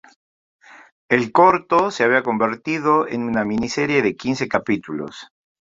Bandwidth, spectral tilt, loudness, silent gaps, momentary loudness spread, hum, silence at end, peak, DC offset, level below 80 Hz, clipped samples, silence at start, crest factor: 7.8 kHz; -5.5 dB/octave; -19 LUFS; 0.92-1.09 s; 10 LU; none; 0.55 s; -2 dBFS; under 0.1%; -56 dBFS; under 0.1%; 0.75 s; 18 dB